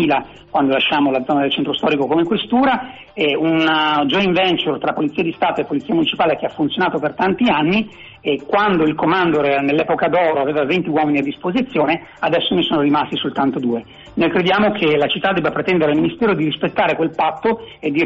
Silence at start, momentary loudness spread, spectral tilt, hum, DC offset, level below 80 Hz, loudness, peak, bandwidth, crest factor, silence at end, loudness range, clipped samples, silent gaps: 0 s; 6 LU; -3 dB/octave; none; under 0.1%; -52 dBFS; -17 LUFS; -6 dBFS; 7.4 kHz; 12 dB; 0 s; 2 LU; under 0.1%; none